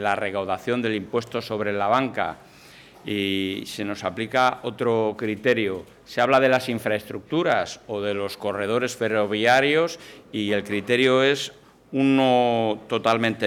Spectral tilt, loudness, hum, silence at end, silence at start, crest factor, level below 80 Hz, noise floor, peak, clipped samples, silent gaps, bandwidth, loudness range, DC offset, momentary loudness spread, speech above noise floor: -5 dB/octave; -23 LUFS; none; 0 s; 0 s; 16 dB; -64 dBFS; -48 dBFS; -8 dBFS; under 0.1%; none; 17.5 kHz; 4 LU; under 0.1%; 11 LU; 25 dB